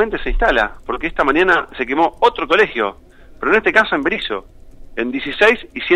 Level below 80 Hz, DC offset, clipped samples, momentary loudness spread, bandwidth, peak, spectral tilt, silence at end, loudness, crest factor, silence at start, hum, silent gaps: -32 dBFS; under 0.1%; under 0.1%; 10 LU; 12 kHz; -2 dBFS; -5 dB/octave; 0 s; -16 LUFS; 16 dB; 0 s; none; none